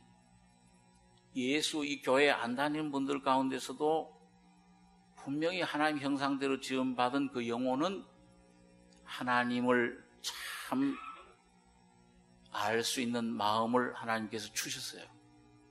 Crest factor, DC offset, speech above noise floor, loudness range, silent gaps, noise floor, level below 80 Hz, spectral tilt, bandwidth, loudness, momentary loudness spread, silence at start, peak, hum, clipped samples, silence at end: 22 dB; under 0.1%; 32 dB; 3 LU; none; -65 dBFS; -74 dBFS; -3.5 dB/octave; 13 kHz; -34 LUFS; 13 LU; 1.35 s; -12 dBFS; none; under 0.1%; 0.65 s